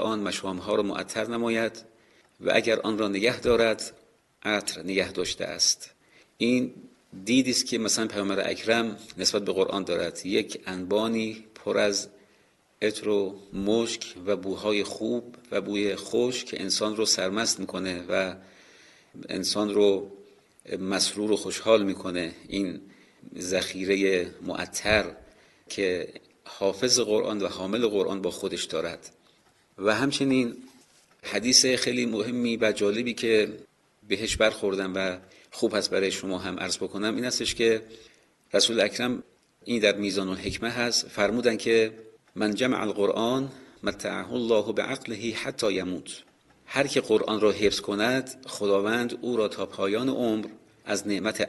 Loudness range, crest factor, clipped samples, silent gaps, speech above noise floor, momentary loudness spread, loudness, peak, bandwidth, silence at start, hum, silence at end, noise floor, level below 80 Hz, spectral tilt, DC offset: 4 LU; 22 dB; under 0.1%; none; 37 dB; 10 LU; -26 LUFS; -4 dBFS; 12.5 kHz; 0 s; none; 0 s; -63 dBFS; -56 dBFS; -3 dB/octave; under 0.1%